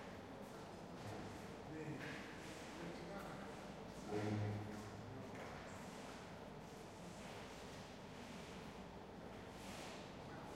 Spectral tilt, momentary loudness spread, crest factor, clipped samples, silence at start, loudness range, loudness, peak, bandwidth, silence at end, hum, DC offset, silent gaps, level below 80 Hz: -5.5 dB/octave; 8 LU; 20 dB; under 0.1%; 0 s; 5 LU; -51 LUFS; -32 dBFS; 16 kHz; 0 s; none; under 0.1%; none; -68 dBFS